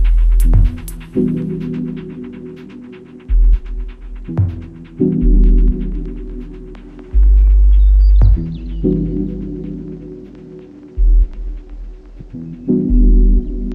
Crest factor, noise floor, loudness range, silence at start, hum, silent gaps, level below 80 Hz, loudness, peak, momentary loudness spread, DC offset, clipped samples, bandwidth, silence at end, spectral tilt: 12 dB; -35 dBFS; 7 LU; 0 s; none; none; -14 dBFS; -16 LUFS; 0 dBFS; 22 LU; under 0.1%; under 0.1%; 2.9 kHz; 0 s; -9.5 dB/octave